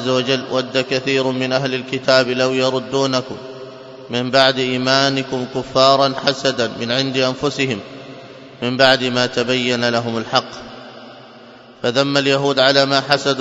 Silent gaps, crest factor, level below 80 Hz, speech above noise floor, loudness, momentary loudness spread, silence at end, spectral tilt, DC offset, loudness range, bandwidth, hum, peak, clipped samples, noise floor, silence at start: none; 18 dB; -58 dBFS; 24 dB; -17 LUFS; 19 LU; 0 s; -4 dB/octave; under 0.1%; 2 LU; 10.5 kHz; none; 0 dBFS; under 0.1%; -41 dBFS; 0 s